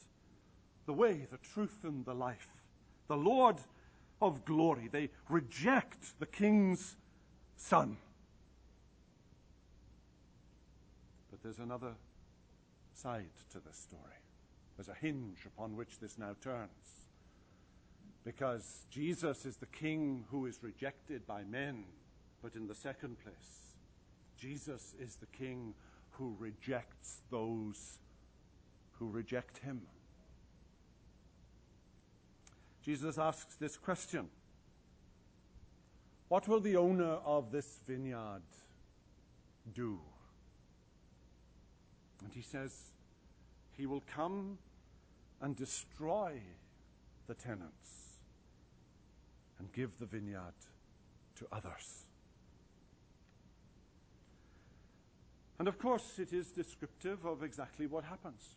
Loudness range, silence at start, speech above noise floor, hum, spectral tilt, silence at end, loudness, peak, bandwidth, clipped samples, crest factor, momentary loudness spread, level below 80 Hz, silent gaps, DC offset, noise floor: 18 LU; 0 s; 27 dB; none; -6 dB/octave; 0.05 s; -40 LUFS; -14 dBFS; 9.8 kHz; under 0.1%; 28 dB; 23 LU; -68 dBFS; none; under 0.1%; -66 dBFS